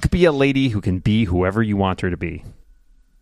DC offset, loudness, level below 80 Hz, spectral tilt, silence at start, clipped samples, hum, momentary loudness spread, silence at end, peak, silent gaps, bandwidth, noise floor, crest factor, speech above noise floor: under 0.1%; -19 LUFS; -34 dBFS; -7 dB/octave; 0 s; under 0.1%; none; 11 LU; 0.7 s; -2 dBFS; none; 12.5 kHz; -52 dBFS; 18 dB; 34 dB